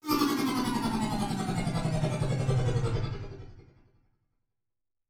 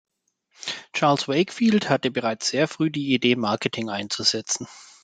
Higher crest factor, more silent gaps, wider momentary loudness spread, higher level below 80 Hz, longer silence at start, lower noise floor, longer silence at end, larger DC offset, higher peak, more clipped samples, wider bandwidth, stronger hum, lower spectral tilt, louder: about the same, 16 dB vs 20 dB; neither; about the same, 9 LU vs 8 LU; first, -44 dBFS vs -68 dBFS; second, 0.05 s vs 0.6 s; first, under -90 dBFS vs -62 dBFS; first, 1.5 s vs 0.2 s; neither; second, -14 dBFS vs -4 dBFS; neither; first, over 20 kHz vs 9.4 kHz; neither; first, -6 dB/octave vs -4 dB/octave; second, -30 LUFS vs -23 LUFS